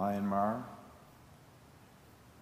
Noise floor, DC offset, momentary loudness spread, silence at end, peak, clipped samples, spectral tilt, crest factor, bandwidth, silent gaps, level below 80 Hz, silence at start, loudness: -59 dBFS; under 0.1%; 26 LU; 0 s; -20 dBFS; under 0.1%; -8 dB/octave; 18 dB; 15.5 kHz; none; -68 dBFS; 0 s; -34 LUFS